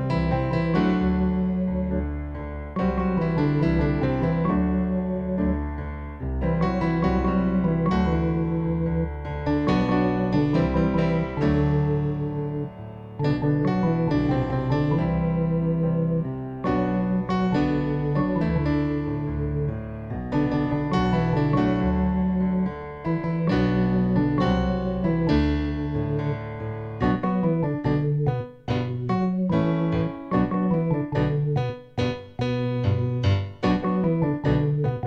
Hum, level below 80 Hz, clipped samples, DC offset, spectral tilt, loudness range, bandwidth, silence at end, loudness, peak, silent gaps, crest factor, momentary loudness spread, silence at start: none; -36 dBFS; under 0.1%; under 0.1%; -9.5 dB/octave; 2 LU; 6.8 kHz; 0 s; -24 LUFS; -10 dBFS; none; 14 dB; 7 LU; 0 s